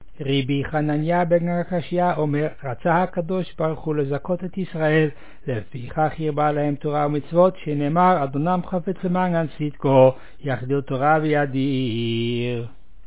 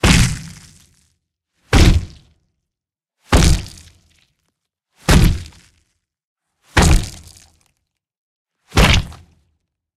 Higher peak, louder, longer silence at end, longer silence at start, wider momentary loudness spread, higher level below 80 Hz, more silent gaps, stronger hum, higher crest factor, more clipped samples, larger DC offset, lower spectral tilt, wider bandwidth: about the same, -2 dBFS vs 0 dBFS; second, -22 LUFS vs -15 LUFS; second, 0.4 s vs 0.85 s; first, 0.2 s vs 0.05 s; second, 9 LU vs 18 LU; second, -50 dBFS vs -22 dBFS; second, none vs 6.24-6.36 s, 8.17-8.45 s; neither; about the same, 18 dB vs 18 dB; neither; first, 2% vs under 0.1%; first, -11 dB/octave vs -4.5 dB/octave; second, 4 kHz vs 15 kHz